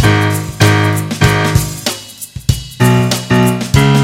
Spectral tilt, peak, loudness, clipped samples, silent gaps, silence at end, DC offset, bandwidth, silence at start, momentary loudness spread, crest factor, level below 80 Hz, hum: -5 dB/octave; 0 dBFS; -13 LUFS; 0.1%; none; 0 s; under 0.1%; 16.5 kHz; 0 s; 9 LU; 12 dB; -28 dBFS; none